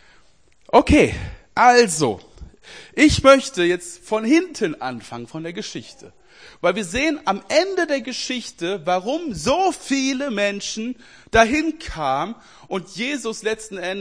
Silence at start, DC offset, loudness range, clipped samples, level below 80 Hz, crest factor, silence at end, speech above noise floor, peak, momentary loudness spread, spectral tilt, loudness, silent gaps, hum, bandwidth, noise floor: 0.75 s; 0.2%; 7 LU; under 0.1%; -40 dBFS; 20 dB; 0 s; 37 dB; 0 dBFS; 17 LU; -4 dB/octave; -20 LUFS; none; none; 10.5 kHz; -57 dBFS